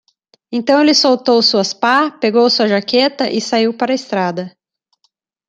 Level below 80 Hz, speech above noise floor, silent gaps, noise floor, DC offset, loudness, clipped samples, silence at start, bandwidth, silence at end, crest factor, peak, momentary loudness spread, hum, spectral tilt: -64 dBFS; 51 dB; none; -64 dBFS; under 0.1%; -14 LUFS; under 0.1%; 0.5 s; 9.2 kHz; 1 s; 14 dB; 0 dBFS; 9 LU; none; -3.5 dB/octave